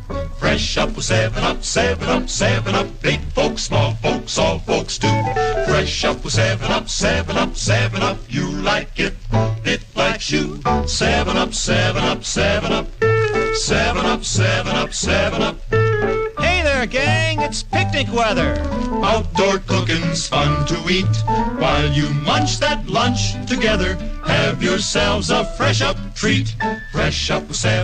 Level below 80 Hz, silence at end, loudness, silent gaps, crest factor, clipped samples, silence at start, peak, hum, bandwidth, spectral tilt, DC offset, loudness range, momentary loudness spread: -28 dBFS; 0 s; -18 LUFS; none; 14 dB; under 0.1%; 0 s; -6 dBFS; none; 9.8 kHz; -4.5 dB/octave; under 0.1%; 1 LU; 4 LU